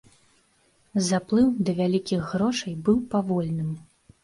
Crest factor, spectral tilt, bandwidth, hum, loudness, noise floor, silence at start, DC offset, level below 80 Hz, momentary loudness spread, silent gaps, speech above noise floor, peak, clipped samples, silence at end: 16 dB; -6 dB/octave; 11.5 kHz; none; -25 LUFS; -64 dBFS; 0.95 s; under 0.1%; -56 dBFS; 9 LU; none; 40 dB; -10 dBFS; under 0.1%; 0.4 s